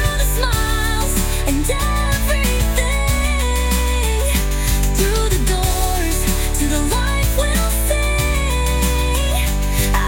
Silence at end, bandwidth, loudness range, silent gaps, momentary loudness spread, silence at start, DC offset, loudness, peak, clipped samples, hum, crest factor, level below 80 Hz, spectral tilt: 0 s; 17 kHz; 0 LU; none; 1 LU; 0 s; under 0.1%; -18 LUFS; -2 dBFS; under 0.1%; none; 14 dB; -18 dBFS; -4 dB/octave